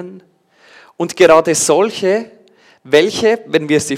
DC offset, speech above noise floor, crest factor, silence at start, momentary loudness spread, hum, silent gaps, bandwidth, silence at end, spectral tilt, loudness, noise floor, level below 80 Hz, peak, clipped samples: under 0.1%; 33 dB; 14 dB; 0 s; 12 LU; none; none; 15.5 kHz; 0 s; -3.5 dB/octave; -13 LUFS; -46 dBFS; -54 dBFS; 0 dBFS; under 0.1%